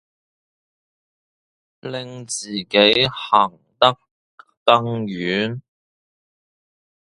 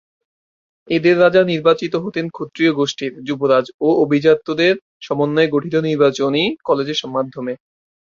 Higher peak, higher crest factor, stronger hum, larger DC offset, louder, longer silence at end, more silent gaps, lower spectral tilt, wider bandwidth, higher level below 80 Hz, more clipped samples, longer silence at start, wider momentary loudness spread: about the same, 0 dBFS vs 0 dBFS; about the same, 22 dB vs 18 dB; neither; neither; about the same, -18 LUFS vs -17 LUFS; first, 1.45 s vs 0.55 s; first, 4.11-4.38 s, 4.57-4.66 s vs 3.74-3.79 s, 4.82-5.01 s; second, -4 dB/octave vs -6 dB/octave; first, 11.5 kHz vs 7.4 kHz; about the same, -60 dBFS vs -60 dBFS; neither; first, 1.85 s vs 0.85 s; first, 16 LU vs 11 LU